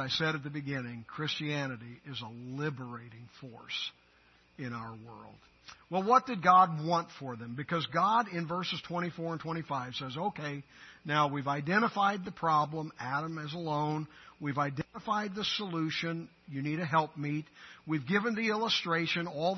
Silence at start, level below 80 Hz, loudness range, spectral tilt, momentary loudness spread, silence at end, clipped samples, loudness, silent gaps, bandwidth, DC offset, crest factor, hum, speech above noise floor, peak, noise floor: 0 s; -72 dBFS; 11 LU; -3.5 dB/octave; 15 LU; 0 s; under 0.1%; -32 LUFS; none; 6.2 kHz; under 0.1%; 22 dB; none; 31 dB; -10 dBFS; -64 dBFS